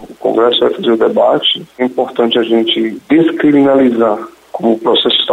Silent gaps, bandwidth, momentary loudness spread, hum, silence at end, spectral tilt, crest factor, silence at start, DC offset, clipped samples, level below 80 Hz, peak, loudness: none; 9 kHz; 6 LU; none; 0 s; -6 dB/octave; 10 dB; 0 s; under 0.1%; under 0.1%; -56 dBFS; -2 dBFS; -12 LUFS